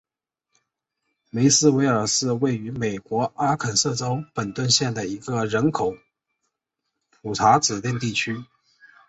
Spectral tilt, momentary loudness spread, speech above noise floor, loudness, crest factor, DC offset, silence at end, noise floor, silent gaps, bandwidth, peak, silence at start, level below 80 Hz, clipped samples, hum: -4 dB/octave; 11 LU; 61 dB; -22 LUFS; 20 dB; under 0.1%; 0.65 s; -83 dBFS; none; 8.2 kHz; -4 dBFS; 1.35 s; -58 dBFS; under 0.1%; none